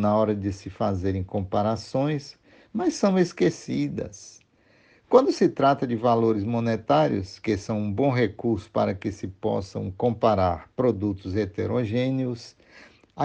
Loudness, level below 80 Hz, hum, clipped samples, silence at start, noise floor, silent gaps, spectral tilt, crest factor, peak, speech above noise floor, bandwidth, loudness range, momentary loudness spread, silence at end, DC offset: -25 LUFS; -58 dBFS; none; under 0.1%; 0 s; -60 dBFS; none; -7 dB/octave; 22 dB; -4 dBFS; 36 dB; 9.4 kHz; 3 LU; 10 LU; 0 s; under 0.1%